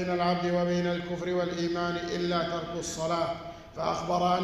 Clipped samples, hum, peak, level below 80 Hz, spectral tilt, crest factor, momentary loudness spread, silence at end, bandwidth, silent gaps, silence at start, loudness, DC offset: under 0.1%; none; -14 dBFS; -54 dBFS; -5.5 dB/octave; 16 dB; 6 LU; 0 s; 12.5 kHz; none; 0 s; -30 LUFS; under 0.1%